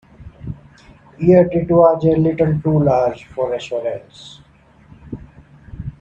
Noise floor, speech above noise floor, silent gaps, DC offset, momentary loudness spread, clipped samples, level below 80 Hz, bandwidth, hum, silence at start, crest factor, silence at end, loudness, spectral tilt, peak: -49 dBFS; 34 dB; none; under 0.1%; 22 LU; under 0.1%; -44 dBFS; 8 kHz; none; 0.2 s; 18 dB; 0.1 s; -16 LUFS; -9 dB/octave; 0 dBFS